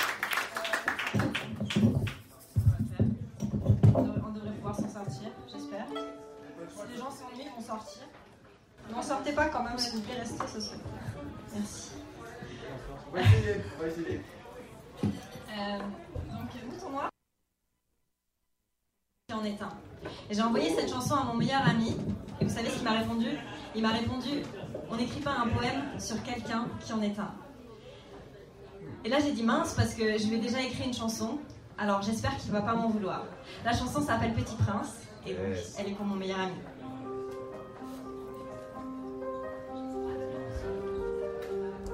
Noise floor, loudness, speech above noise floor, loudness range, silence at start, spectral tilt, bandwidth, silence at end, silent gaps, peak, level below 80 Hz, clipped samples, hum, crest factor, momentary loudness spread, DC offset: -80 dBFS; -33 LUFS; 49 dB; 10 LU; 0 s; -5.5 dB/octave; 16 kHz; 0 s; none; -10 dBFS; -50 dBFS; under 0.1%; none; 22 dB; 15 LU; under 0.1%